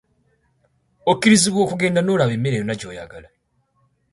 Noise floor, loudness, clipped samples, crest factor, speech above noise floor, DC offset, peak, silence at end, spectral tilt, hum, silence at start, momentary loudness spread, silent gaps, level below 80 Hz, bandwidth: -66 dBFS; -18 LUFS; under 0.1%; 20 dB; 48 dB; under 0.1%; -2 dBFS; 0.9 s; -4.5 dB/octave; none; 1.05 s; 18 LU; none; -54 dBFS; 11.5 kHz